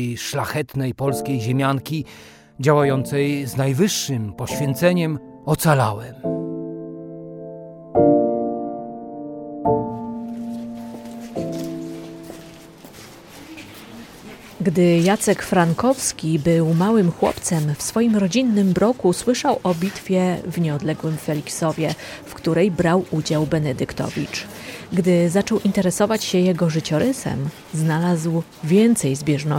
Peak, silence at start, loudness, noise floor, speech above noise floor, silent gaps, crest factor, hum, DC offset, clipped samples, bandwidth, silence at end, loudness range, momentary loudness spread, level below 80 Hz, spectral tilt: -2 dBFS; 0 s; -20 LUFS; -42 dBFS; 22 dB; none; 18 dB; none; under 0.1%; under 0.1%; 17 kHz; 0 s; 9 LU; 18 LU; -52 dBFS; -6 dB/octave